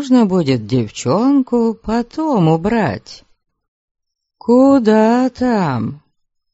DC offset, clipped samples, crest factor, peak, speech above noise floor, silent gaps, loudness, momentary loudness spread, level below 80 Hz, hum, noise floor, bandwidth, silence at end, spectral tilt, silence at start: under 0.1%; under 0.1%; 14 dB; 0 dBFS; 52 dB; 3.68-3.95 s; -15 LUFS; 10 LU; -46 dBFS; none; -66 dBFS; 8 kHz; 0.55 s; -6.5 dB/octave; 0 s